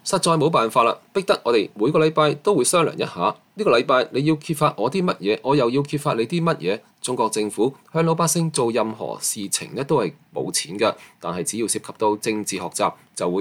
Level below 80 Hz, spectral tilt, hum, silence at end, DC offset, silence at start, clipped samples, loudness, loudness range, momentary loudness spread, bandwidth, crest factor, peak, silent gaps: -64 dBFS; -4.5 dB/octave; none; 0 s; under 0.1%; 0.05 s; under 0.1%; -21 LUFS; 4 LU; 8 LU; 16.5 kHz; 16 dB; -4 dBFS; none